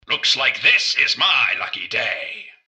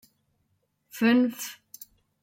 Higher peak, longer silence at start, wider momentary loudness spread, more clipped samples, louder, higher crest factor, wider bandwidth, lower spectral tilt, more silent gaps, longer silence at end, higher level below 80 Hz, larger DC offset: first, -2 dBFS vs -12 dBFS; second, 0.1 s vs 0.95 s; second, 9 LU vs 24 LU; neither; first, -16 LUFS vs -24 LUFS; about the same, 18 dB vs 18 dB; second, 9.4 kHz vs 16.5 kHz; second, 0.5 dB/octave vs -4 dB/octave; neither; second, 0.15 s vs 0.7 s; first, -64 dBFS vs -76 dBFS; neither